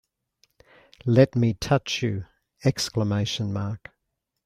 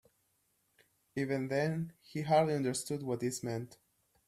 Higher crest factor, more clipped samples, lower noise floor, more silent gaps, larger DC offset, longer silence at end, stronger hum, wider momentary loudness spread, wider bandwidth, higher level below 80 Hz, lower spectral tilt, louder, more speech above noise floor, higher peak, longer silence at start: about the same, 22 dB vs 20 dB; neither; about the same, -80 dBFS vs -77 dBFS; neither; neither; first, 0.7 s vs 0.55 s; neither; about the same, 14 LU vs 12 LU; about the same, 15 kHz vs 14.5 kHz; first, -52 dBFS vs -74 dBFS; about the same, -6 dB/octave vs -5.5 dB/octave; first, -25 LUFS vs -35 LUFS; first, 57 dB vs 43 dB; first, -4 dBFS vs -16 dBFS; about the same, 1.05 s vs 1.15 s